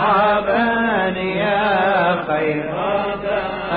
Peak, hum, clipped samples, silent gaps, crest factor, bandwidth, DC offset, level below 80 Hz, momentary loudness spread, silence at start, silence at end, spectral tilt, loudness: -6 dBFS; none; under 0.1%; none; 12 dB; 5 kHz; under 0.1%; -46 dBFS; 6 LU; 0 s; 0 s; -10.5 dB/octave; -18 LUFS